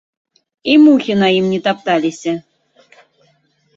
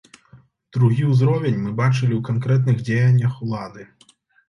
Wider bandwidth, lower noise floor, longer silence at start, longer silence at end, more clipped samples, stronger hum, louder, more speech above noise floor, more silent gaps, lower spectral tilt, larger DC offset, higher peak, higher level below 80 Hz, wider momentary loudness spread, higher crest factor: first, 7.8 kHz vs 7 kHz; about the same, -58 dBFS vs -56 dBFS; first, 0.65 s vs 0.35 s; first, 1.35 s vs 0.65 s; neither; neither; first, -14 LUFS vs -20 LUFS; first, 46 dB vs 38 dB; neither; second, -6 dB/octave vs -8.5 dB/octave; neither; first, 0 dBFS vs -6 dBFS; about the same, -60 dBFS vs -56 dBFS; first, 14 LU vs 11 LU; about the same, 16 dB vs 14 dB